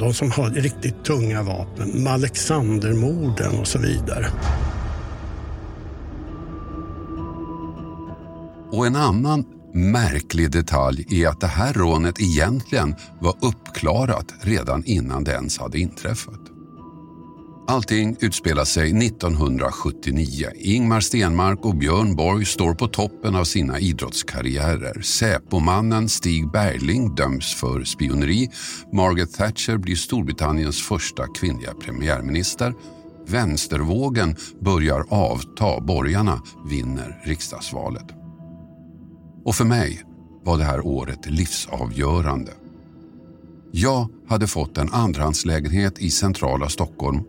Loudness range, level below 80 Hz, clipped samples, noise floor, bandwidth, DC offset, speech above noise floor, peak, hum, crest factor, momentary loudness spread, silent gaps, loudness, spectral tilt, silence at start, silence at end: 6 LU; -32 dBFS; under 0.1%; -44 dBFS; 16.5 kHz; under 0.1%; 23 dB; -4 dBFS; none; 18 dB; 14 LU; none; -22 LUFS; -5 dB/octave; 0 s; 0 s